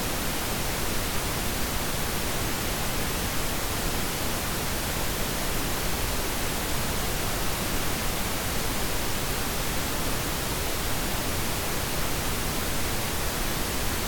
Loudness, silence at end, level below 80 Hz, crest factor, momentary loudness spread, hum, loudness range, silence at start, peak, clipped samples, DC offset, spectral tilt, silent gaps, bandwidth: -28 LUFS; 0 s; -36 dBFS; 12 dB; 0 LU; none; 0 LU; 0 s; -14 dBFS; under 0.1%; under 0.1%; -3 dB/octave; none; 19 kHz